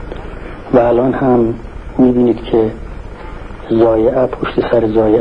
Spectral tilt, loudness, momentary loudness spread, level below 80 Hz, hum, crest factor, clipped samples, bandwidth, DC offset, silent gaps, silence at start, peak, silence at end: -9.5 dB/octave; -13 LUFS; 20 LU; -30 dBFS; none; 14 dB; under 0.1%; 5.4 kHz; 0.8%; none; 0 s; 0 dBFS; 0 s